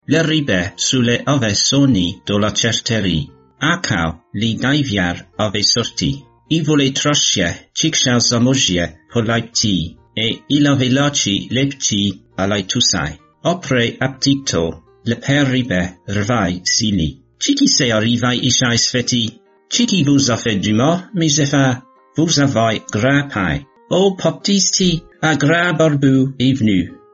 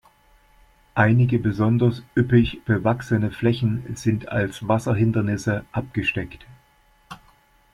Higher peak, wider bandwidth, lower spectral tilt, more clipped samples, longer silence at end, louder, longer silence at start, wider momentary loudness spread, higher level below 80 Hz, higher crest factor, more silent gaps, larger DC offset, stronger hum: about the same, -2 dBFS vs -4 dBFS; second, 8 kHz vs 12 kHz; second, -4 dB/octave vs -7.5 dB/octave; neither; second, 0.2 s vs 0.6 s; first, -16 LUFS vs -22 LUFS; second, 0.1 s vs 0.95 s; about the same, 8 LU vs 7 LU; about the same, -42 dBFS vs -46 dBFS; about the same, 14 dB vs 18 dB; neither; neither; neither